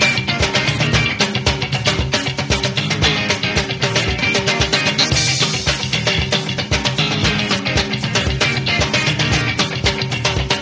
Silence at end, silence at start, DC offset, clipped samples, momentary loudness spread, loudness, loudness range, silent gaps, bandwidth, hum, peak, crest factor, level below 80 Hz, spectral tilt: 0 s; 0 s; under 0.1%; under 0.1%; 3 LU; -16 LUFS; 1 LU; none; 8 kHz; none; 0 dBFS; 18 dB; -30 dBFS; -3.5 dB/octave